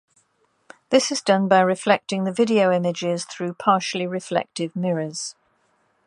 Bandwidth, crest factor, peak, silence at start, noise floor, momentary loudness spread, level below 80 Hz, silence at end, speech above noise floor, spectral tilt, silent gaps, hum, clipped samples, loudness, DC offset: 11.5 kHz; 20 dB; -2 dBFS; 0.9 s; -66 dBFS; 10 LU; -74 dBFS; 0.75 s; 45 dB; -4.5 dB/octave; none; none; under 0.1%; -21 LUFS; under 0.1%